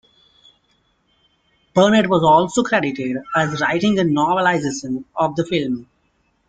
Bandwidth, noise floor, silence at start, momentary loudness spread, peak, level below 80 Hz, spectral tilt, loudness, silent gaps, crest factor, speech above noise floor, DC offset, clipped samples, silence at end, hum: 9.4 kHz; -64 dBFS; 1.75 s; 11 LU; -2 dBFS; -54 dBFS; -5.5 dB/octave; -18 LUFS; none; 18 dB; 47 dB; under 0.1%; under 0.1%; 0.65 s; none